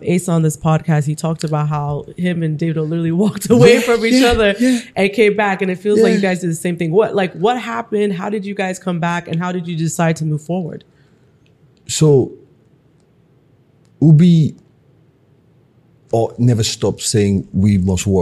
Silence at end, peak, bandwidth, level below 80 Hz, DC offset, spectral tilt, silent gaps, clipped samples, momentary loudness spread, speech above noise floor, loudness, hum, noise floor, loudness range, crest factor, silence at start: 0 s; 0 dBFS; 13 kHz; -42 dBFS; under 0.1%; -6 dB/octave; none; under 0.1%; 10 LU; 38 dB; -15 LUFS; none; -53 dBFS; 7 LU; 16 dB; 0 s